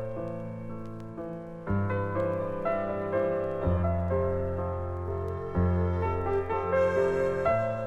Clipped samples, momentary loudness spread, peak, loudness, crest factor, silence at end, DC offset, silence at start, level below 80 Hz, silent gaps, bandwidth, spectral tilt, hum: under 0.1%; 12 LU; -14 dBFS; -30 LUFS; 14 dB; 0 s; under 0.1%; 0 s; -44 dBFS; none; 7.2 kHz; -9 dB/octave; none